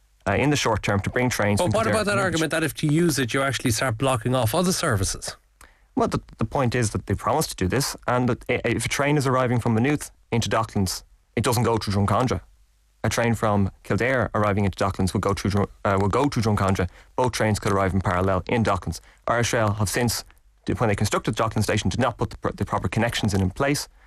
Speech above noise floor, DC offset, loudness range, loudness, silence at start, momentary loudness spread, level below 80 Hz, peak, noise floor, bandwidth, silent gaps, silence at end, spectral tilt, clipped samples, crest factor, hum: 36 dB; under 0.1%; 2 LU; -23 LUFS; 0.25 s; 6 LU; -44 dBFS; -10 dBFS; -59 dBFS; 14.5 kHz; none; 0.2 s; -5 dB/octave; under 0.1%; 14 dB; none